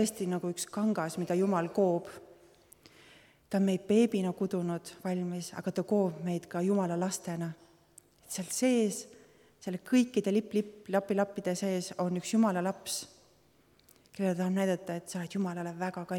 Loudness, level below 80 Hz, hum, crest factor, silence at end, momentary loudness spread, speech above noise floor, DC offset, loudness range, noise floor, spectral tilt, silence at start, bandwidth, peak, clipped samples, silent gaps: -32 LUFS; -74 dBFS; none; 18 dB; 0 s; 10 LU; 34 dB; under 0.1%; 3 LU; -66 dBFS; -5.5 dB/octave; 0 s; 17.5 kHz; -14 dBFS; under 0.1%; none